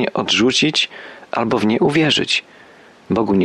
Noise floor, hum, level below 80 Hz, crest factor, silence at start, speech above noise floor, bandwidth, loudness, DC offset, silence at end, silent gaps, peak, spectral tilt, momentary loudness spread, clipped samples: -45 dBFS; none; -54 dBFS; 14 dB; 0 s; 28 dB; 11.5 kHz; -16 LUFS; under 0.1%; 0 s; none; -4 dBFS; -4 dB/octave; 9 LU; under 0.1%